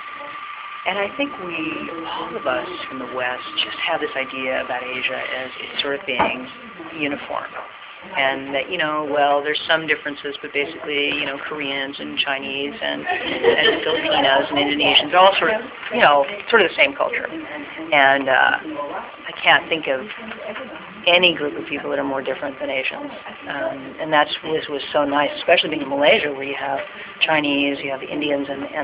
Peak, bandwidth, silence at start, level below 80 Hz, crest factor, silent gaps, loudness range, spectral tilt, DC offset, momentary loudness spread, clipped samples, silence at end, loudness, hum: 0 dBFS; 4 kHz; 0 s; -58 dBFS; 20 dB; none; 8 LU; -7 dB/octave; under 0.1%; 15 LU; under 0.1%; 0 s; -20 LUFS; none